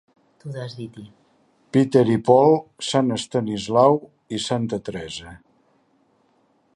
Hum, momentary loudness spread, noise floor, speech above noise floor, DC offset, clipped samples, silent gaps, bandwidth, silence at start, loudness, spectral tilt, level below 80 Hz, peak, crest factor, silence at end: none; 19 LU; -63 dBFS; 43 dB; under 0.1%; under 0.1%; none; 11.5 kHz; 0.45 s; -20 LUFS; -6 dB/octave; -58 dBFS; -2 dBFS; 20 dB; 1.4 s